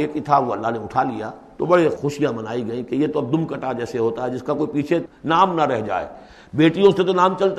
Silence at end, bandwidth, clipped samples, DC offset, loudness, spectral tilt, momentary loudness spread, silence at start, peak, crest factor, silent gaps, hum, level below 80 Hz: 0 s; 10.5 kHz; under 0.1%; under 0.1%; -20 LUFS; -7 dB/octave; 10 LU; 0 s; -2 dBFS; 18 dB; none; none; -54 dBFS